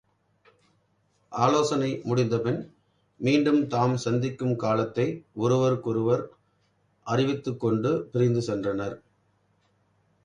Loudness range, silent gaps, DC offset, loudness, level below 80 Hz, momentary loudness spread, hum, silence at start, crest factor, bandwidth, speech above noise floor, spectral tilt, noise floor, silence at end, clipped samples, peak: 3 LU; none; under 0.1%; -26 LUFS; -64 dBFS; 9 LU; 50 Hz at -60 dBFS; 1.3 s; 20 dB; 10.5 kHz; 44 dB; -7 dB/octave; -69 dBFS; 1.25 s; under 0.1%; -6 dBFS